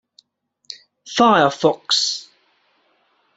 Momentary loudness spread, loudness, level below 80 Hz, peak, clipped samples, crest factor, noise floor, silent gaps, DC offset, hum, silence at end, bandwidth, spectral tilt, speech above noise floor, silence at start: 24 LU; -17 LUFS; -64 dBFS; -2 dBFS; under 0.1%; 20 dB; -67 dBFS; none; under 0.1%; none; 1.15 s; 8.2 kHz; -3 dB/octave; 51 dB; 0.7 s